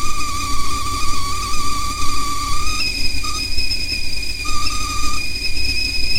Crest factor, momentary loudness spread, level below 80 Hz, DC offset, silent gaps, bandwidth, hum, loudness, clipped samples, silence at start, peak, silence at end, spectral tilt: 12 dB; 3 LU; -26 dBFS; under 0.1%; none; 16 kHz; none; -21 LUFS; under 0.1%; 0 s; -2 dBFS; 0 s; -1.5 dB/octave